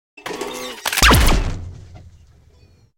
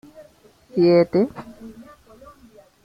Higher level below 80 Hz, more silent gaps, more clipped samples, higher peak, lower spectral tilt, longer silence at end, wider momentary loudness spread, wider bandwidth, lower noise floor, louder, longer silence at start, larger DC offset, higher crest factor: first, -24 dBFS vs -58 dBFS; neither; neither; about the same, -4 dBFS vs -6 dBFS; second, -3 dB/octave vs -8.5 dB/octave; about the same, 1 s vs 1.05 s; second, 20 LU vs 25 LU; first, 17 kHz vs 5.8 kHz; about the same, -51 dBFS vs -52 dBFS; about the same, -17 LUFS vs -19 LUFS; second, 0.25 s vs 0.75 s; neither; about the same, 16 dB vs 18 dB